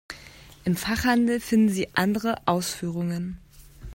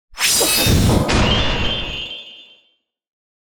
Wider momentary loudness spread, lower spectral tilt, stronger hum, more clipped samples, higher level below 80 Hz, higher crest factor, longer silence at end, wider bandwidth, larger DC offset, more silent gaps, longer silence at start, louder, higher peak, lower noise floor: about the same, 14 LU vs 15 LU; first, -5 dB/octave vs -3.5 dB/octave; neither; neither; second, -48 dBFS vs -28 dBFS; about the same, 20 dB vs 16 dB; second, 0 s vs 0.95 s; second, 16.5 kHz vs over 20 kHz; neither; neither; about the same, 0.1 s vs 0.15 s; second, -25 LUFS vs -16 LUFS; about the same, -6 dBFS vs -4 dBFS; second, -48 dBFS vs -63 dBFS